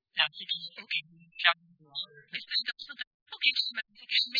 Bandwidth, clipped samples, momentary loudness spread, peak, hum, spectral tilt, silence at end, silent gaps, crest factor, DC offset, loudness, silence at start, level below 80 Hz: 5.4 kHz; under 0.1%; 15 LU; -8 dBFS; none; -0.5 dB/octave; 0 s; 3.07-3.26 s; 26 dB; under 0.1%; -30 LUFS; 0.15 s; -84 dBFS